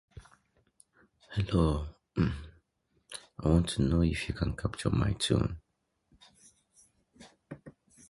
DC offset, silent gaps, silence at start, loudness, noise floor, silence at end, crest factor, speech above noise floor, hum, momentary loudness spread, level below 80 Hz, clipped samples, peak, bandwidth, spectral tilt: under 0.1%; none; 0.15 s; -31 LUFS; -75 dBFS; 0.4 s; 20 dB; 46 dB; none; 19 LU; -42 dBFS; under 0.1%; -12 dBFS; 11.5 kHz; -6 dB/octave